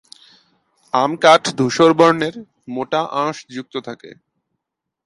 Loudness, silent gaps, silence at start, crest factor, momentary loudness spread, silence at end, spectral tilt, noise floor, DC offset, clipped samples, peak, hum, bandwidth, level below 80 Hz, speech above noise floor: -16 LUFS; none; 0.95 s; 18 dB; 18 LU; 0.95 s; -4.5 dB/octave; -80 dBFS; under 0.1%; under 0.1%; 0 dBFS; none; 11.5 kHz; -62 dBFS; 64 dB